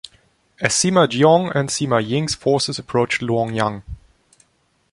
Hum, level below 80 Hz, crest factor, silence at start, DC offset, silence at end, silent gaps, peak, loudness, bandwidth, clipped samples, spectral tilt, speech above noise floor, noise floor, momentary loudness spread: none; -48 dBFS; 18 dB; 0.6 s; under 0.1%; 0.95 s; none; -2 dBFS; -18 LUFS; 11.5 kHz; under 0.1%; -4.5 dB/octave; 45 dB; -63 dBFS; 9 LU